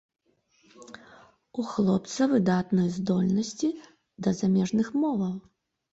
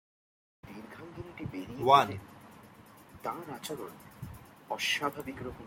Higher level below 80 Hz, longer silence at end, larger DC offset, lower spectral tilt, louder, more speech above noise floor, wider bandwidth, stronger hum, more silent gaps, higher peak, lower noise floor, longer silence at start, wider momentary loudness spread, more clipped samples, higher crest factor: about the same, -64 dBFS vs -62 dBFS; first, 0.55 s vs 0 s; neither; first, -6.5 dB/octave vs -4 dB/octave; first, -27 LUFS vs -31 LUFS; first, 40 dB vs 24 dB; second, 8 kHz vs 16.5 kHz; neither; neither; second, -12 dBFS vs -8 dBFS; first, -66 dBFS vs -55 dBFS; first, 0.8 s vs 0.65 s; second, 16 LU vs 25 LU; neither; second, 16 dB vs 28 dB